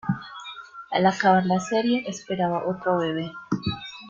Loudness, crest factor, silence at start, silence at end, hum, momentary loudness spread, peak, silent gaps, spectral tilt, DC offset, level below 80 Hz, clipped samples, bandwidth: -24 LUFS; 20 dB; 0.05 s; 0 s; none; 14 LU; -6 dBFS; none; -5.5 dB/octave; under 0.1%; -58 dBFS; under 0.1%; 7.6 kHz